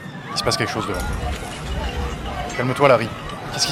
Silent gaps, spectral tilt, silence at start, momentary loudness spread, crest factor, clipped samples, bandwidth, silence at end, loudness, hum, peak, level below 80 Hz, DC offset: none; -4 dB/octave; 0 s; 12 LU; 22 dB; under 0.1%; 17 kHz; 0 s; -22 LUFS; none; -2 dBFS; -32 dBFS; under 0.1%